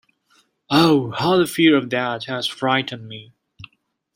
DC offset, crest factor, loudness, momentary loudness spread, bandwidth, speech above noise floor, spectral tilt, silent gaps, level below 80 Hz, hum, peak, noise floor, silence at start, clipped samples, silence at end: under 0.1%; 18 dB; -19 LUFS; 16 LU; 16.5 kHz; 44 dB; -5.5 dB/octave; none; -60 dBFS; none; -2 dBFS; -63 dBFS; 0.7 s; under 0.1%; 0.5 s